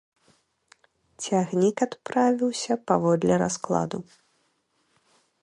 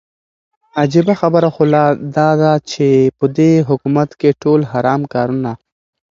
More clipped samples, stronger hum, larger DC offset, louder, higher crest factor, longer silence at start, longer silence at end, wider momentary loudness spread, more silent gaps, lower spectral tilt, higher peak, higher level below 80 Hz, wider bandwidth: neither; neither; neither; second, -25 LUFS vs -14 LUFS; first, 20 dB vs 14 dB; first, 1.2 s vs 0.75 s; first, 1.4 s vs 0.55 s; about the same, 7 LU vs 6 LU; neither; second, -5.5 dB/octave vs -7.5 dB/octave; second, -6 dBFS vs 0 dBFS; second, -64 dBFS vs -54 dBFS; first, 11 kHz vs 7.4 kHz